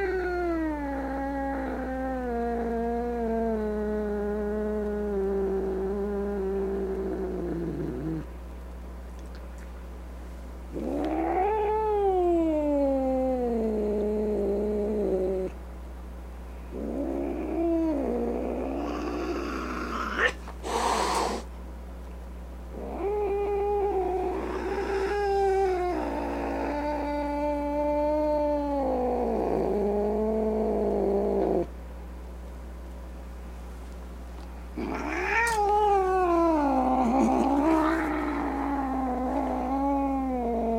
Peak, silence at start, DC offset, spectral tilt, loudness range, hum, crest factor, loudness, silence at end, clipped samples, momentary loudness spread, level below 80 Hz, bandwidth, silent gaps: -10 dBFS; 0 s; under 0.1%; -6.5 dB/octave; 8 LU; none; 18 dB; -28 LUFS; 0 s; under 0.1%; 18 LU; -40 dBFS; 16 kHz; none